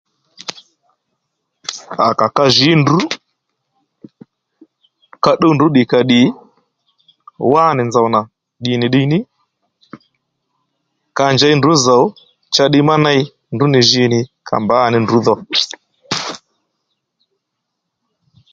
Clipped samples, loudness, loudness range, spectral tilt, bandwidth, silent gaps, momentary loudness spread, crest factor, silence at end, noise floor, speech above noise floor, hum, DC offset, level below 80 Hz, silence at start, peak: under 0.1%; -13 LUFS; 5 LU; -5 dB/octave; 8.8 kHz; none; 17 LU; 16 dB; 2.15 s; -75 dBFS; 63 dB; none; under 0.1%; -54 dBFS; 0.5 s; 0 dBFS